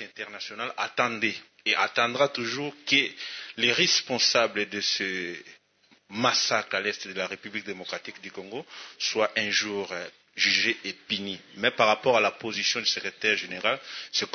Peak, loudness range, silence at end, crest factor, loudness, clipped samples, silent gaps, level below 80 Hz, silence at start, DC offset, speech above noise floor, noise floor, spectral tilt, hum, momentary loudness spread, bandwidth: -4 dBFS; 5 LU; 0 s; 24 dB; -26 LUFS; under 0.1%; none; -76 dBFS; 0 s; under 0.1%; 35 dB; -63 dBFS; -1.5 dB/octave; none; 15 LU; 6.6 kHz